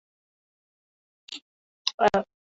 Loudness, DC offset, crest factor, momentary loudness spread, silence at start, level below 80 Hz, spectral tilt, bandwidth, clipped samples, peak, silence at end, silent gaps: -26 LUFS; under 0.1%; 28 dB; 18 LU; 1.3 s; -62 dBFS; -3.5 dB/octave; 8 kHz; under 0.1%; -4 dBFS; 0.3 s; 1.42-1.85 s, 1.94-1.98 s